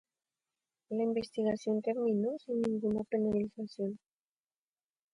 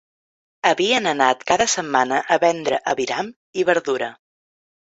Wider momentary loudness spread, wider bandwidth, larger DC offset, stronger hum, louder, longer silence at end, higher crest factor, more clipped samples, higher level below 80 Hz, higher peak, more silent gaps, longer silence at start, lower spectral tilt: about the same, 8 LU vs 7 LU; first, 10.5 kHz vs 8.2 kHz; neither; neither; second, -34 LUFS vs -20 LUFS; first, 1.15 s vs 0.7 s; second, 14 dB vs 20 dB; neither; second, -70 dBFS vs -60 dBFS; second, -20 dBFS vs 0 dBFS; second, none vs 3.36-3.53 s; first, 0.9 s vs 0.65 s; first, -7.5 dB/octave vs -2.5 dB/octave